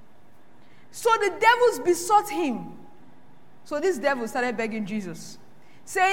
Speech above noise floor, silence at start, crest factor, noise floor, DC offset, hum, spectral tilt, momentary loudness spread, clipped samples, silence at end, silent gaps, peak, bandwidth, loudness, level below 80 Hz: 33 dB; 0.95 s; 20 dB; -57 dBFS; 0.8%; none; -3.5 dB/octave; 18 LU; under 0.1%; 0 s; none; -6 dBFS; 16.5 kHz; -24 LUFS; -72 dBFS